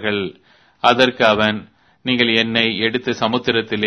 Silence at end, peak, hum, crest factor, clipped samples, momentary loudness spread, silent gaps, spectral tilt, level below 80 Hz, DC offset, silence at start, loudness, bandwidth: 0 s; 0 dBFS; none; 18 dB; under 0.1%; 10 LU; none; -5 dB/octave; -54 dBFS; under 0.1%; 0 s; -16 LUFS; 11 kHz